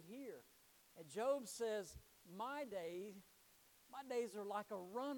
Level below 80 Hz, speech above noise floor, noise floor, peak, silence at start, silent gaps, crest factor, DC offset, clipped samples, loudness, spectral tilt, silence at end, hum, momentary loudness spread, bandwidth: -78 dBFS; 25 dB; -71 dBFS; -30 dBFS; 0 s; none; 18 dB; under 0.1%; under 0.1%; -47 LUFS; -4 dB/octave; 0 s; none; 25 LU; 19 kHz